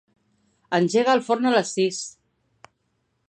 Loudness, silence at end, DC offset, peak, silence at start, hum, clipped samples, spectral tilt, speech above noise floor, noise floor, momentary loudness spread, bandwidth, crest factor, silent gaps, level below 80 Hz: -22 LUFS; 1.2 s; under 0.1%; -6 dBFS; 0.7 s; none; under 0.1%; -4.5 dB/octave; 51 dB; -72 dBFS; 9 LU; 10.5 kHz; 18 dB; none; -76 dBFS